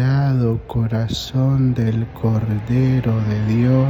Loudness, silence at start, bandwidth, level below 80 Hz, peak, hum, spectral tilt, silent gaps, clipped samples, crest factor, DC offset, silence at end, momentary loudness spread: -19 LUFS; 0 s; 7.8 kHz; -38 dBFS; -4 dBFS; none; -8 dB/octave; none; under 0.1%; 12 dB; under 0.1%; 0 s; 4 LU